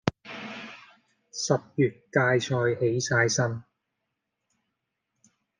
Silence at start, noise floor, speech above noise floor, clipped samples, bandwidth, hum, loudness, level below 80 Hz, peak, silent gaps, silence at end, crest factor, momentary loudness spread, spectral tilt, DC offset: 0.05 s; -82 dBFS; 57 dB; under 0.1%; 10 kHz; none; -26 LUFS; -68 dBFS; -4 dBFS; none; 1.95 s; 26 dB; 17 LU; -4.5 dB/octave; under 0.1%